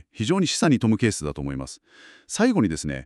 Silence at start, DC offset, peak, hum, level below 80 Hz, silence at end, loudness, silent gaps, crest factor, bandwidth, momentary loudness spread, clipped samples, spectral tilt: 0.15 s; under 0.1%; -6 dBFS; none; -46 dBFS; 0 s; -23 LUFS; none; 18 dB; 12.5 kHz; 13 LU; under 0.1%; -5 dB/octave